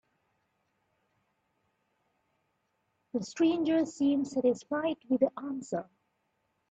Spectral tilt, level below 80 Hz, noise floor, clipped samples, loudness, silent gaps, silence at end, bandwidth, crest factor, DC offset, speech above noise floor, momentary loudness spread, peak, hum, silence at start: -5.5 dB/octave; -78 dBFS; -78 dBFS; under 0.1%; -31 LUFS; none; 0.85 s; 8.2 kHz; 20 dB; under 0.1%; 48 dB; 10 LU; -14 dBFS; none; 3.15 s